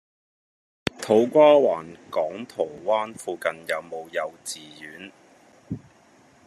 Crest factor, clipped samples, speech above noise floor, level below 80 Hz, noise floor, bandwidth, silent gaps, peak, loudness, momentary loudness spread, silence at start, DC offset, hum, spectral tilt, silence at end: 24 dB; under 0.1%; 33 dB; -64 dBFS; -56 dBFS; 13 kHz; none; -2 dBFS; -23 LUFS; 22 LU; 0.85 s; under 0.1%; none; -4.5 dB/octave; 0.7 s